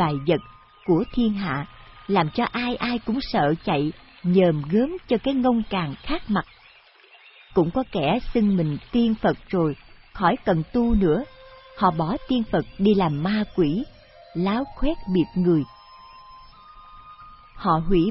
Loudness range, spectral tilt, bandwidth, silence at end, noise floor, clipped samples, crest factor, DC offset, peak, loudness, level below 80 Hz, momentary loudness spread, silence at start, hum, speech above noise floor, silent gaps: 3 LU; -11 dB/octave; 5.8 kHz; 0 s; -52 dBFS; under 0.1%; 18 dB; under 0.1%; -6 dBFS; -23 LUFS; -40 dBFS; 9 LU; 0 s; none; 31 dB; none